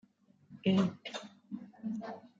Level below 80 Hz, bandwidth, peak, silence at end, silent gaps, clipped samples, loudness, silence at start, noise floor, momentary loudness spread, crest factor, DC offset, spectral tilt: -78 dBFS; 7.6 kHz; -16 dBFS; 0.1 s; none; under 0.1%; -36 LUFS; 0.5 s; -63 dBFS; 17 LU; 20 dB; under 0.1%; -7 dB/octave